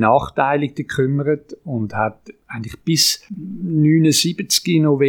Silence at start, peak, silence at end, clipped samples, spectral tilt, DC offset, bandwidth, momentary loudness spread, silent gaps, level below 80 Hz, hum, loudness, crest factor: 0 s; 0 dBFS; 0 s; under 0.1%; -4.5 dB/octave; under 0.1%; 20 kHz; 13 LU; none; -50 dBFS; none; -18 LUFS; 18 dB